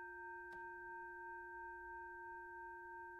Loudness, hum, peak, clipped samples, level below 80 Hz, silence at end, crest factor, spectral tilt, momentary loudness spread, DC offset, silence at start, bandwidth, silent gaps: -52 LUFS; none; -44 dBFS; under 0.1%; -74 dBFS; 0 s; 10 dB; -6 dB/octave; 1 LU; under 0.1%; 0 s; 16 kHz; none